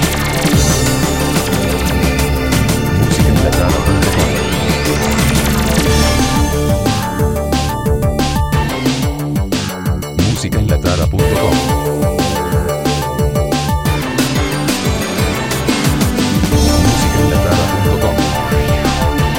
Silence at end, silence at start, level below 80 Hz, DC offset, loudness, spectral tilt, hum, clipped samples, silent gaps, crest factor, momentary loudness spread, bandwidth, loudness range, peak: 0 s; 0 s; -20 dBFS; 0.9%; -14 LUFS; -5 dB/octave; none; under 0.1%; none; 14 dB; 4 LU; 17 kHz; 2 LU; 0 dBFS